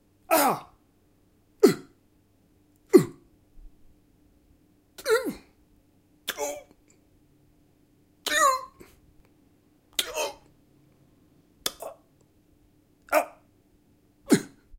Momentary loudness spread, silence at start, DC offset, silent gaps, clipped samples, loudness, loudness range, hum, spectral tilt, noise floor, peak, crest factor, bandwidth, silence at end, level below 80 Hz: 16 LU; 0.3 s; under 0.1%; none; under 0.1%; -26 LUFS; 8 LU; none; -3.5 dB/octave; -63 dBFS; -2 dBFS; 28 dB; 16.5 kHz; 0.3 s; -62 dBFS